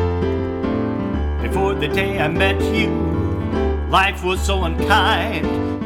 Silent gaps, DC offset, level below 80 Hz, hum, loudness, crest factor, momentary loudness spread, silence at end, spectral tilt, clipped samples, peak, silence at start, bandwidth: none; under 0.1%; -26 dBFS; none; -19 LUFS; 18 dB; 6 LU; 0 s; -6 dB/octave; under 0.1%; 0 dBFS; 0 s; 16 kHz